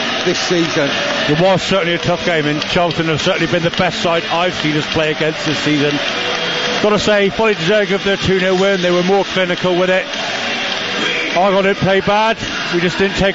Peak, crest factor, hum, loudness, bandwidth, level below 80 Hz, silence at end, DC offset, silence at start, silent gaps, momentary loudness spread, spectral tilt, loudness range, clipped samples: -2 dBFS; 12 dB; none; -15 LUFS; 8 kHz; -42 dBFS; 0 s; 0.3%; 0 s; none; 4 LU; -4.5 dB/octave; 1 LU; under 0.1%